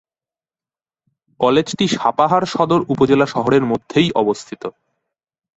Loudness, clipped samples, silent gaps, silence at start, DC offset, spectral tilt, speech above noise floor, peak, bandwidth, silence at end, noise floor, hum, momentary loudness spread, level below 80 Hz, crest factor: -16 LUFS; under 0.1%; none; 1.4 s; under 0.1%; -5.5 dB/octave; over 74 dB; -2 dBFS; 8.2 kHz; 0.85 s; under -90 dBFS; none; 8 LU; -54 dBFS; 16 dB